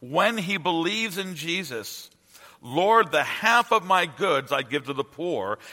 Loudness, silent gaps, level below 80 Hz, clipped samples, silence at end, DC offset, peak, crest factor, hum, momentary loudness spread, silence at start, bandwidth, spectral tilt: -24 LUFS; none; -72 dBFS; under 0.1%; 0 s; under 0.1%; -4 dBFS; 22 dB; none; 11 LU; 0 s; 16.5 kHz; -3.5 dB/octave